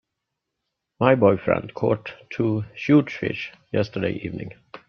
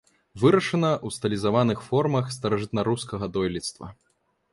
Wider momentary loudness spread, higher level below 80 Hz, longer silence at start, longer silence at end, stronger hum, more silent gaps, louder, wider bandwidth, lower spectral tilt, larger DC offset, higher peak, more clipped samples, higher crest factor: first, 14 LU vs 10 LU; about the same, -58 dBFS vs -54 dBFS; first, 1 s vs 0.35 s; second, 0.1 s vs 0.6 s; neither; neither; about the same, -23 LUFS vs -25 LUFS; second, 6.6 kHz vs 11.5 kHz; first, -8.5 dB/octave vs -6 dB/octave; neither; first, -2 dBFS vs -6 dBFS; neither; about the same, 22 dB vs 20 dB